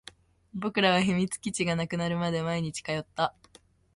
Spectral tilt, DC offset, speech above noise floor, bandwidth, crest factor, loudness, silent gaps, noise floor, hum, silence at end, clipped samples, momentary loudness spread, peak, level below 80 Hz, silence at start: -5 dB/octave; under 0.1%; 32 dB; 11.5 kHz; 20 dB; -29 LUFS; none; -60 dBFS; none; 0.65 s; under 0.1%; 10 LU; -10 dBFS; -60 dBFS; 0.55 s